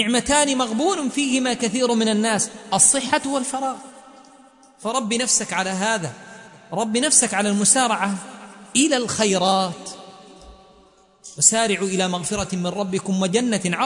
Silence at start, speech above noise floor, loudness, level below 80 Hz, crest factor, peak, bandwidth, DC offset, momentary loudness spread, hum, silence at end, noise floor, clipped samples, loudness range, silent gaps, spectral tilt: 0 s; 33 dB; -19 LUFS; -54 dBFS; 22 dB; 0 dBFS; 11 kHz; under 0.1%; 14 LU; none; 0 s; -54 dBFS; under 0.1%; 4 LU; none; -2.5 dB/octave